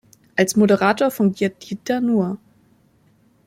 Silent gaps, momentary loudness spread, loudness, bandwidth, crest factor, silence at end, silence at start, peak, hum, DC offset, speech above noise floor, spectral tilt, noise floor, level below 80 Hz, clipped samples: none; 11 LU; -19 LUFS; 16 kHz; 18 dB; 1.1 s; 0.35 s; -2 dBFS; none; under 0.1%; 39 dB; -5.5 dB/octave; -57 dBFS; -62 dBFS; under 0.1%